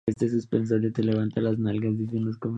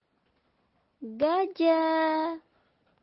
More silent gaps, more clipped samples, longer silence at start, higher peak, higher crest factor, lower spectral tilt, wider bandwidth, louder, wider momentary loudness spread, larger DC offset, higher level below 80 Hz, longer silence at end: neither; neither; second, 0.05 s vs 1 s; first, -10 dBFS vs -14 dBFS; about the same, 16 dB vs 16 dB; about the same, -9 dB/octave vs -8 dB/octave; first, 8.6 kHz vs 5.8 kHz; about the same, -26 LUFS vs -26 LUFS; second, 3 LU vs 18 LU; neither; first, -58 dBFS vs -76 dBFS; second, 0 s vs 0.65 s